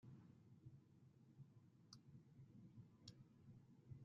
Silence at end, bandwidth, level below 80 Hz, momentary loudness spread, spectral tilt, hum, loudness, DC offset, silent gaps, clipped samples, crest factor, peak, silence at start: 0 s; 6.4 kHz; -86 dBFS; 4 LU; -7 dB/octave; none; -67 LUFS; under 0.1%; none; under 0.1%; 22 dB; -42 dBFS; 0 s